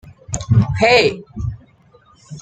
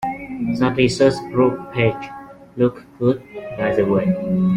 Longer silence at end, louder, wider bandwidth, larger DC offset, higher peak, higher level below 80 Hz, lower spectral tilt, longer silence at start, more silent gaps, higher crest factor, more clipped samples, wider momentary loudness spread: about the same, 0 s vs 0 s; first, -16 LUFS vs -19 LUFS; second, 9.4 kHz vs 10.5 kHz; neither; about the same, 0 dBFS vs -2 dBFS; first, -38 dBFS vs -48 dBFS; second, -5 dB/octave vs -7 dB/octave; about the same, 0.05 s vs 0 s; neither; about the same, 18 dB vs 16 dB; neither; about the same, 16 LU vs 14 LU